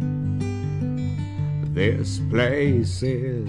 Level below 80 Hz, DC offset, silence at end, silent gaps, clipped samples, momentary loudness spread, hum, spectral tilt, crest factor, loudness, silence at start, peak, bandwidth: -44 dBFS; under 0.1%; 0 s; none; under 0.1%; 6 LU; none; -7 dB/octave; 16 dB; -24 LUFS; 0 s; -6 dBFS; 11 kHz